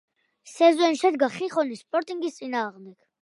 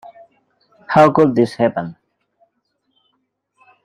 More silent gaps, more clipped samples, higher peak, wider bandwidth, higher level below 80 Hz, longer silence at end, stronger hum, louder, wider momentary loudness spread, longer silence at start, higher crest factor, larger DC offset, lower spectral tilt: neither; neither; second, -6 dBFS vs -2 dBFS; about the same, 11.5 kHz vs 11.5 kHz; second, -82 dBFS vs -58 dBFS; second, 0.3 s vs 1.9 s; neither; second, -24 LUFS vs -15 LUFS; about the same, 12 LU vs 14 LU; second, 0.45 s vs 0.9 s; about the same, 18 dB vs 18 dB; neither; second, -3.5 dB/octave vs -7.5 dB/octave